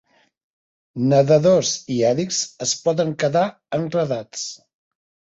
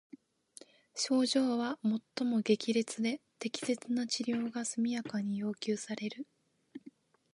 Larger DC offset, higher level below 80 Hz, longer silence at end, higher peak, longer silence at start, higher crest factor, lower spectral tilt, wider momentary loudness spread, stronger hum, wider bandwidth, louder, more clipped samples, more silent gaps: neither; first, -60 dBFS vs -86 dBFS; first, 0.85 s vs 0.45 s; first, -2 dBFS vs -16 dBFS; about the same, 0.95 s vs 0.95 s; about the same, 18 dB vs 18 dB; about the same, -4.5 dB/octave vs -4 dB/octave; second, 12 LU vs 16 LU; neither; second, 8 kHz vs 11.5 kHz; first, -20 LUFS vs -34 LUFS; neither; neither